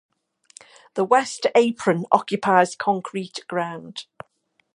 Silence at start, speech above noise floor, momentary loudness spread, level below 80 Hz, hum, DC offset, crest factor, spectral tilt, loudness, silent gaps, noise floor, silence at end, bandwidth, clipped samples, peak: 0.95 s; 47 dB; 15 LU; -72 dBFS; none; under 0.1%; 22 dB; -4.5 dB/octave; -21 LUFS; none; -68 dBFS; 0.7 s; 11.5 kHz; under 0.1%; 0 dBFS